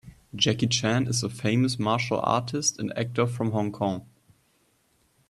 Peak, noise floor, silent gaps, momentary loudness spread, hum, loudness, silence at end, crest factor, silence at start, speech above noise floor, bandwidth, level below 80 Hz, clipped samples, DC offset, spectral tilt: -6 dBFS; -67 dBFS; none; 6 LU; none; -26 LUFS; 1.25 s; 20 dB; 0.05 s; 41 dB; 12.5 kHz; -60 dBFS; under 0.1%; under 0.1%; -4.5 dB/octave